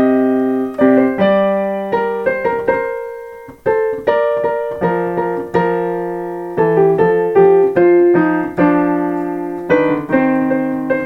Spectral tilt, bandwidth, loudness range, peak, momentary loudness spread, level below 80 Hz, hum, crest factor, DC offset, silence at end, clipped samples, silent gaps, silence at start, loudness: -8.5 dB/octave; 6 kHz; 5 LU; 0 dBFS; 10 LU; -50 dBFS; none; 14 dB; under 0.1%; 0 s; under 0.1%; none; 0 s; -15 LUFS